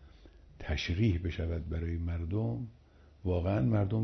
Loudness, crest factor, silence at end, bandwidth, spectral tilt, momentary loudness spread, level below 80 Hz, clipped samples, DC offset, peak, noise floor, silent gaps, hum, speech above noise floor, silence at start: -33 LUFS; 16 dB; 0 s; 6.2 kHz; -7 dB/octave; 11 LU; -44 dBFS; under 0.1%; under 0.1%; -18 dBFS; -56 dBFS; none; none; 24 dB; 0 s